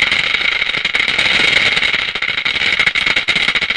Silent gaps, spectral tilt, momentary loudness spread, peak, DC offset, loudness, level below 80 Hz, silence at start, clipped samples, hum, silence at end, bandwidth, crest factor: none; -1 dB/octave; 5 LU; 0 dBFS; 0.2%; -12 LUFS; -42 dBFS; 0 s; under 0.1%; none; 0 s; 10.5 kHz; 16 dB